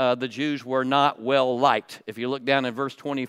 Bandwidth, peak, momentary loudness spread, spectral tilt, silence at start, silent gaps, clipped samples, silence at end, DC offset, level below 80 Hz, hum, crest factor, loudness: 14.5 kHz; -4 dBFS; 9 LU; -5.5 dB/octave; 0 s; none; under 0.1%; 0 s; under 0.1%; -78 dBFS; none; 20 dB; -24 LUFS